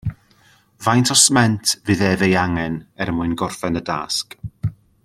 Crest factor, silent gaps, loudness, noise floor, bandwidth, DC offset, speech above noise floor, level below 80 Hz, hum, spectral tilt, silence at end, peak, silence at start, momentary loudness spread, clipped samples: 20 dB; none; -18 LUFS; -54 dBFS; 15.5 kHz; under 0.1%; 36 dB; -46 dBFS; none; -3.5 dB/octave; 0.35 s; 0 dBFS; 0.05 s; 16 LU; under 0.1%